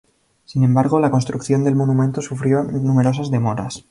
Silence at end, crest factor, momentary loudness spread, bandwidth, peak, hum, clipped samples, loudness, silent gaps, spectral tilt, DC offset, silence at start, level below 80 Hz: 0.1 s; 14 dB; 6 LU; 11 kHz; -4 dBFS; none; under 0.1%; -18 LUFS; none; -7.5 dB/octave; under 0.1%; 0.5 s; -52 dBFS